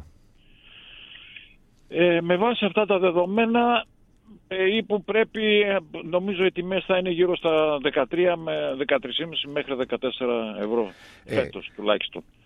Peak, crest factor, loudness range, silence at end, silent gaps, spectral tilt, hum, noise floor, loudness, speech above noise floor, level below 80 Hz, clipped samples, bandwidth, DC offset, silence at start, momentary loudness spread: -6 dBFS; 18 dB; 4 LU; 0.25 s; none; -7 dB/octave; none; -54 dBFS; -24 LUFS; 31 dB; -58 dBFS; under 0.1%; 6 kHz; under 0.1%; 0 s; 11 LU